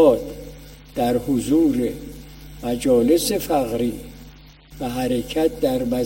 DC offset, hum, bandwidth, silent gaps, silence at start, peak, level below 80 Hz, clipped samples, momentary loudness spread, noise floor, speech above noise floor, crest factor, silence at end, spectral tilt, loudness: under 0.1%; 50 Hz at -40 dBFS; 16.5 kHz; none; 0 s; -4 dBFS; -42 dBFS; under 0.1%; 20 LU; -44 dBFS; 25 dB; 18 dB; 0 s; -5.5 dB/octave; -21 LUFS